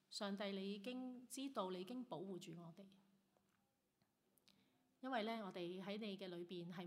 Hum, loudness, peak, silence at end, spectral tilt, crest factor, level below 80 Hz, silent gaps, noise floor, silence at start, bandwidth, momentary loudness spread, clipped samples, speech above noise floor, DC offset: none; -50 LUFS; -30 dBFS; 0 s; -5 dB/octave; 22 dB; under -90 dBFS; none; -85 dBFS; 0.1 s; 15.5 kHz; 10 LU; under 0.1%; 36 dB; under 0.1%